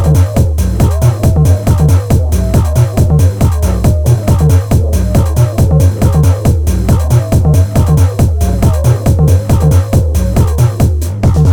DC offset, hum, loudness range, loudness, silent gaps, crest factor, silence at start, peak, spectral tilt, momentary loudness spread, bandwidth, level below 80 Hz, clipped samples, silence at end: under 0.1%; none; 1 LU; -10 LUFS; none; 8 dB; 0 s; 0 dBFS; -7.5 dB/octave; 2 LU; 19.5 kHz; -16 dBFS; under 0.1%; 0 s